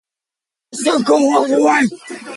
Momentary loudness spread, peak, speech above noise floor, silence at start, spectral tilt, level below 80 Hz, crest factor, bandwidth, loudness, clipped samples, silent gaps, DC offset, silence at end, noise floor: 13 LU; -2 dBFS; 72 dB; 0.75 s; -3.5 dB/octave; -66 dBFS; 14 dB; 11.5 kHz; -14 LUFS; under 0.1%; none; under 0.1%; 0 s; -87 dBFS